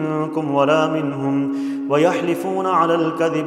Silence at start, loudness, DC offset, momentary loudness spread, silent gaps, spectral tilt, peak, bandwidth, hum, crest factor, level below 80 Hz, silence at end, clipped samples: 0 s; -19 LUFS; under 0.1%; 5 LU; none; -6.5 dB/octave; -4 dBFS; 14 kHz; none; 16 dB; -68 dBFS; 0 s; under 0.1%